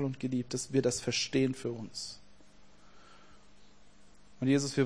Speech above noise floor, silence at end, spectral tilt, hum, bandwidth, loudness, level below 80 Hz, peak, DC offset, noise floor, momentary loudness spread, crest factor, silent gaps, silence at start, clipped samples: 29 dB; 0 s; -4.5 dB/octave; 50 Hz at -65 dBFS; 10.5 kHz; -33 LUFS; -64 dBFS; -14 dBFS; 0.2%; -61 dBFS; 12 LU; 20 dB; none; 0 s; under 0.1%